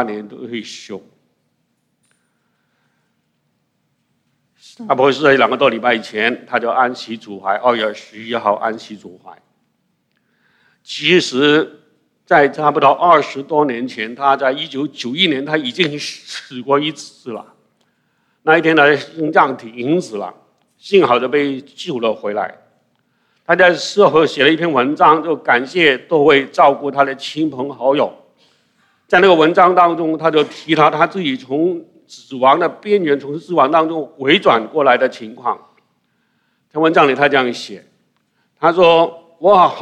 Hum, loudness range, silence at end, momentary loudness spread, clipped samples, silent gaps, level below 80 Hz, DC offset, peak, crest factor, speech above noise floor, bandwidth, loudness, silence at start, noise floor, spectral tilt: none; 6 LU; 0 s; 16 LU; under 0.1%; none; -62 dBFS; under 0.1%; 0 dBFS; 16 dB; 52 dB; 10.5 kHz; -14 LUFS; 0 s; -66 dBFS; -5 dB/octave